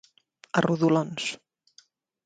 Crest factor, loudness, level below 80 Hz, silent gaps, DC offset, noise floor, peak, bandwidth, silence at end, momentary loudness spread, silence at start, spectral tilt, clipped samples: 22 dB; -26 LUFS; -68 dBFS; none; under 0.1%; -61 dBFS; -6 dBFS; 9.4 kHz; 0.9 s; 10 LU; 0.55 s; -5.5 dB/octave; under 0.1%